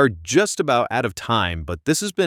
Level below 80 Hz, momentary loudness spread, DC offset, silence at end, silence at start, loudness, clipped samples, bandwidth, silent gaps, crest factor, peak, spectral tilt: -46 dBFS; 6 LU; under 0.1%; 0 s; 0 s; -21 LUFS; under 0.1%; 18 kHz; none; 18 dB; -2 dBFS; -4 dB/octave